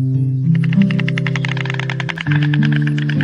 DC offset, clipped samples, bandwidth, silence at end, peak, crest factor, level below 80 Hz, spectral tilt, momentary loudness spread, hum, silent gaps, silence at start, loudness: under 0.1%; under 0.1%; 7.4 kHz; 0 s; 0 dBFS; 16 dB; -54 dBFS; -7.5 dB/octave; 6 LU; none; none; 0 s; -16 LUFS